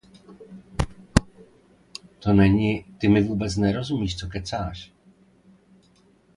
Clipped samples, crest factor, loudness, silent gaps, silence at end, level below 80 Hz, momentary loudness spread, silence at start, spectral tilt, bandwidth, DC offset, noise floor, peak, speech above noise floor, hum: under 0.1%; 24 dB; -24 LUFS; none; 1.5 s; -38 dBFS; 23 LU; 0.3 s; -6.5 dB/octave; 11.5 kHz; under 0.1%; -59 dBFS; 0 dBFS; 37 dB; none